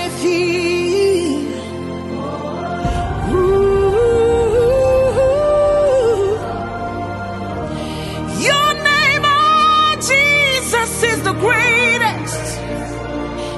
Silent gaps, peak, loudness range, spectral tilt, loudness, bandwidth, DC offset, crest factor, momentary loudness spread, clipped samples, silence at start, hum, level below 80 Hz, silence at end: none; 0 dBFS; 5 LU; -4 dB/octave; -15 LUFS; 12.5 kHz; under 0.1%; 14 dB; 13 LU; under 0.1%; 0 s; none; -34 dBFS; 0 s